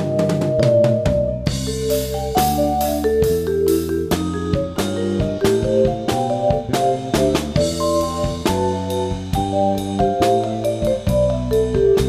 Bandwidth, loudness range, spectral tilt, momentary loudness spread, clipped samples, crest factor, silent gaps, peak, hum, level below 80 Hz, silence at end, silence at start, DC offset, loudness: 15.5 kHz; 1 LU; -6 dB/octave; 5 LU; under 0.1%; 16 dB; none; -2 dBFS; none; -32 dBFS; 0 s; 0 s; under 0.1%; -19 LUFS